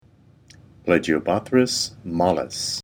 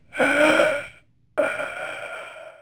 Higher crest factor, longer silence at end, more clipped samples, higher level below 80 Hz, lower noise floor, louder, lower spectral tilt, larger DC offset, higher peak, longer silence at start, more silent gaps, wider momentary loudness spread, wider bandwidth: about the same, 20 dB vs 18 dB; about the same, 0 s vs 0.1 s; neither; first, -54 dBFS vs -60 dBFS; about the same, -54 dBFS vs -52 dBFS; about the same, -22 LUFS vs -22 LUFS; about the same, -4 dB/octave vs -3.5 dB/octave; neither; about the same, -4 dBFS vs -6 dBFS; first, 0.85 s vs 0.15 s; neither; second, 6 LU vs 19 LU; about the same, over 20 kHz vs over 20 kHz